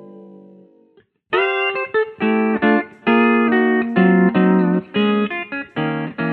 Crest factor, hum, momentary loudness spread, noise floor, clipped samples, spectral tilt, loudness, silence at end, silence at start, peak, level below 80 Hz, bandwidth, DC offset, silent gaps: 16 dB; none; 9 LU; -56 dBFS; under 0.1%; -9.5 dB/octave; -17 LUFS; 0 s; 0 s; -2 dBFS; -62 dBFS; 4.5 kHz; under 0.1%; none